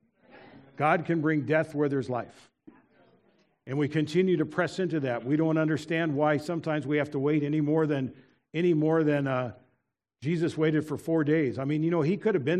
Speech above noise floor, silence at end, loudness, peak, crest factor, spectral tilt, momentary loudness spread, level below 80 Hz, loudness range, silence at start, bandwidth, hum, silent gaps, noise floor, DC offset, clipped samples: 51 dB; 0 s; -28 LUFS; -8 dBFS; 18 dB; -8 dB/octave; 7 LU; -72 dBFS; 3 LU; 0.35 s; 11 kHz; none; none; -78 dBFS; under 0.1%; under 0.1%